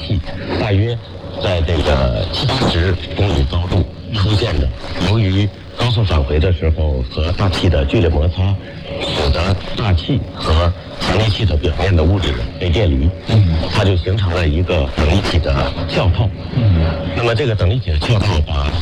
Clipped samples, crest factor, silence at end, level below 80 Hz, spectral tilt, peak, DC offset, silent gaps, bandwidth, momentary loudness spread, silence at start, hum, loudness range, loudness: under 0.1%; 12 dB; 0 s; -22 dBFS; -7 dB/octave; -2 dBFS; under 0.1%; none; 9.8 kHz; 6 LU; 0 s; none; 2 LU; -16 LUFS